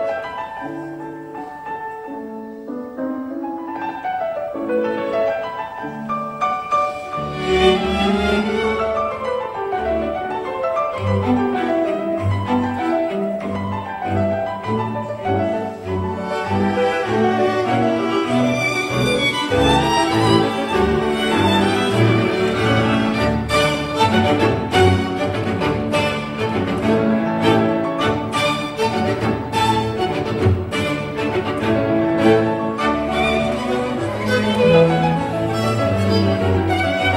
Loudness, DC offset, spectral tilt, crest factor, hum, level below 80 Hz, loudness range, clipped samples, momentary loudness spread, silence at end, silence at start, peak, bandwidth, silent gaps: -19 LUFS; under 0.1%; -6 dB/octave; 18 dB; none; -42 dBFS; 7 LU; under 0.1%; 10 LU; 0 s; 0 s; 0 dBFS; 16 kHz; none